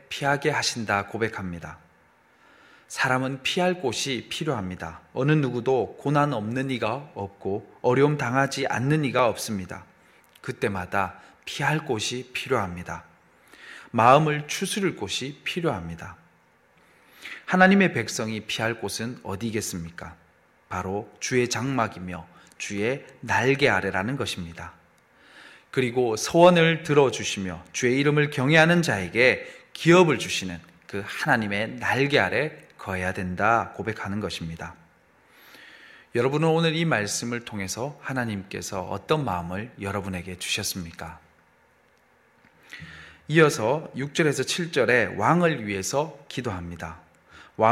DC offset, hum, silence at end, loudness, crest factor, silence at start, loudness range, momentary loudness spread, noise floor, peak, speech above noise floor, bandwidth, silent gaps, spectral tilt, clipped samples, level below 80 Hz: under 0.1%; none; 0 s; -24 LUFS; 22 dB; 0.1 s; 8 LU; 18 LU; -61 dBFS; -2 dBFS; 37 dB; 16 kHz; none; -5 dB/octave; under 0.1%; -58 dBFS